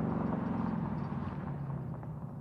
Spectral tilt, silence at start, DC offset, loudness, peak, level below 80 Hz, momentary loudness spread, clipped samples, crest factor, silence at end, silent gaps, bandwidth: -10.5 dB/octave; 0 s; under 0.1%; -37 LUFS; -22 dBFS; -54 dBFS; 7 LU; under 0.1%; 14 dB; 0 s; none; 5.6 kHz